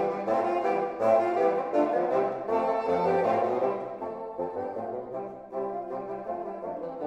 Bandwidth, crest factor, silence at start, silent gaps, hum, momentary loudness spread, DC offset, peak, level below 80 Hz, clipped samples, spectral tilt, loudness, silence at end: 9 kHz; 16 dB; 0 s; none; none; 11 LU; under 0.1%; -12 dBFS; -68 dBFS; under 0.1%; -7.5 dB/octave; -28 LUFS; 0 s